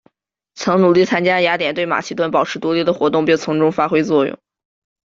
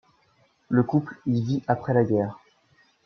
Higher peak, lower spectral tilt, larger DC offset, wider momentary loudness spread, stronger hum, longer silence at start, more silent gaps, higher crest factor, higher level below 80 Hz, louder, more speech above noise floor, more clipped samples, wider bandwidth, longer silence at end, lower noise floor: first, -2 dBFS vs -8 dBFS; second, -5.5 dB/octave vs -9.5 dB/octave; neither; about the same, 6 LU vs 5 LU; neither; second, 0.55 s vs 0.7 s; neither; about the same, 14 dB vs 18 dB; about the same, -58 dBFS vs -62 dBFS; first, -16 LUFS vs -25 LUFS; first, 46 dB vs 41 dB; neither; first, 7.6 kHz vs 6.4 kHz; about the same, 0.7 s vs 0.7 s; about the same, -61 dBFS vs -64 dBFS